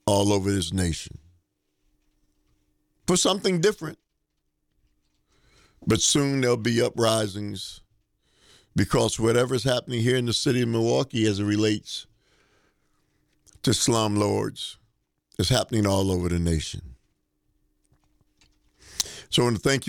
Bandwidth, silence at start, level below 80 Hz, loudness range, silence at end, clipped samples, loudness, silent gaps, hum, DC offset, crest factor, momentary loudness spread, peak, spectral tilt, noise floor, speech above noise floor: 19 kHz; 0.05 s; -48 dBFS; 4 LU; 0 s; under 0.1%; -24 LUFS; none; none; under 0.1%; 18 dB; 13 LU; -8 dBFS; -4.5 dB/octave; -76 dBFS; 52 dB